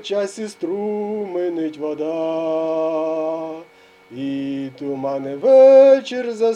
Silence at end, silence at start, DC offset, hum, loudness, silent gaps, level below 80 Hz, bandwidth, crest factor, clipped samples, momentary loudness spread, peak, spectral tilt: 0 s; 0 s; under 0.1%; none; -18 LUFS; none; -72 dBFS; 9.4 kHz; 16 dB; under 0.1%; 17 LU; -2 dBFS; -6 dB/octave